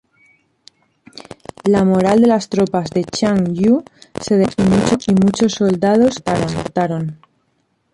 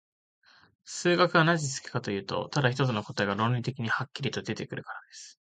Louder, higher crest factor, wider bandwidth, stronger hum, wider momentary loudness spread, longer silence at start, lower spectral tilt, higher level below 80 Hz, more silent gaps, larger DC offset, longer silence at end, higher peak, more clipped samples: first, -15 LUFS vs -28 LUFS; second, 14 dB vs 20 dB; first, 11.5 kHz vs 9.4 kHz; neither; second, 11 LU vs 16 LU; first, 1.65 s vs 0.85 s; first, -6.5 dB/octave vs -5 dB/octave; first, -46 dBFS vs -64 dBFS; neither; neither; first, 0.8 s vs 0.15 s; first, -2 dBFS vs -8 dBFS; neither